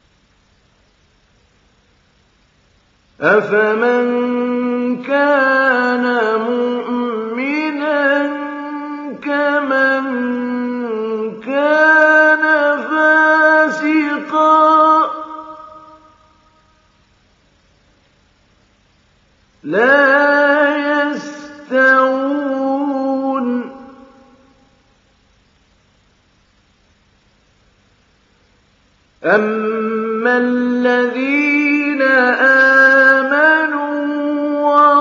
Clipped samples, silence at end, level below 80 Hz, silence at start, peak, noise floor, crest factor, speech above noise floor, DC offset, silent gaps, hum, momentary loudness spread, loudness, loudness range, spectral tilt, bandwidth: under 0.1%; 0 s; -64 dBFS; 3.2 s; 0 dBFS; -55 dBFS; 16 dB; 42 dB; under 0.1%; none; none; 11 LU; -14 LUFS; 10 LU; -5 dB/octave; 7.6 kHz